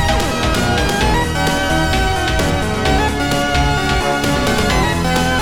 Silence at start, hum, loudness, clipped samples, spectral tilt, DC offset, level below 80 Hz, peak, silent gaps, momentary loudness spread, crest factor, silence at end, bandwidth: 0 s; none; -16 LUFS; under 0.1%; -4.5 dB/octave; 2%; -24 dBFS; -2 dBFS; none; 1 LU; 12 dB; 0 s; 18.5 kHz